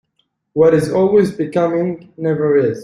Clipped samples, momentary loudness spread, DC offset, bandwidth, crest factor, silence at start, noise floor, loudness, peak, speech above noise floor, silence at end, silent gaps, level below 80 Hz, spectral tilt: under 0.1%; 10 LU; under 0.1%; 12 kHz; 14 dB; 0.55 s; -67 dBFS; -16 LUFS; -2 dBFS; 52 dB; 0 s; none; -54 dBFS; -8 dB/octave